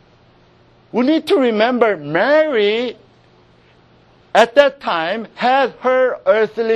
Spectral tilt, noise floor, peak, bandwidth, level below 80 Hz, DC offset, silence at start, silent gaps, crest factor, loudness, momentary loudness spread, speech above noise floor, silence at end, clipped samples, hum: -5 dB/octave; -50 dBFS; 0 dBFS; 12 kHz; -60 dBFS; under 0.1%; 0.95 s; none; 16 dB; -16 LUFS; 7 LU; 35 dB; 0 s; under 0.1%; none